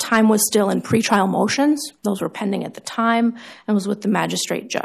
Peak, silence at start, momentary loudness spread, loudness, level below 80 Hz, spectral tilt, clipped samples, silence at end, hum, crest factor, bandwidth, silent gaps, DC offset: -4 dBFS; 0 s; 9 LU; -19 LUFS; -64 dBFS; -4 dB/octave; under 0.1%; 0 s; none; 16 dB; 14.5 kHz; none; under 0.1%